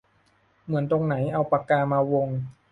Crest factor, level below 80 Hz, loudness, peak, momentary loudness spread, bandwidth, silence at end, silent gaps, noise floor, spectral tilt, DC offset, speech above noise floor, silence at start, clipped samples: 18 dB; -60 dBFS; -25 LUFS; -8 dBFS; 7 LU; 4.4 kHz; 0.2 s; none; -64 dBFS; -10 dB/octave; under 0.1%; 40 dB; 0.65 s; under 0.1%